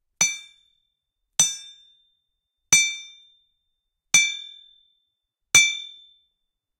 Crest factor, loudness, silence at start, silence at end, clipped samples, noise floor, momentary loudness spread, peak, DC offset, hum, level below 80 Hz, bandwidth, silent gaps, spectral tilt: 24 dB; -19 LUFS; 0.2 s; 0.9 s; under 0.1%; -79 dBFS; 20 LU; -2 dBFS; under 0.1%; none; -64 dBFS; 16 kHz; none; 2 dB/octave